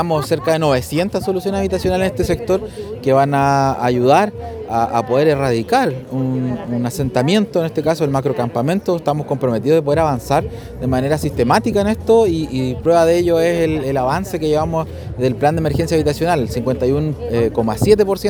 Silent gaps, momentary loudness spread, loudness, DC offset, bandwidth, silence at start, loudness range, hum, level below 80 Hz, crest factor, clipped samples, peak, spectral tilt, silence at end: none; 7 LU; -17 LUFS; under 0.1%; over 20 kHz; 0 s; 2 LU; none; -38 dBFS; 16 dB; under 0.1%; 0 dBFS; -6.5 dB/octave; 0 s